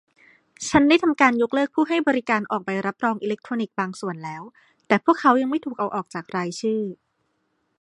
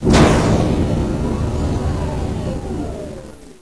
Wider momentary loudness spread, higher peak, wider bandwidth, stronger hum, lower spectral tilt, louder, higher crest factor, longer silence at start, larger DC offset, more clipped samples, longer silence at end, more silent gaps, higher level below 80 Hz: second, 13 LU vs 17 LU; about the same, -2 dBFS vs 0 dBFS; about the same, 11 kHz vs 11 kHz; neither; second, -5 dB/octave vs -6.5 dB/octave; second, -22 LUFS vs -18 LUFS; first, 22 dB vs 16 dB; first, 0.6 s vs 0 s; second, under 0.1% vs 0.6%; neither; first, 0.85 s vs 0.1 s; neither; second, -58 dBFS vs -24 dBFS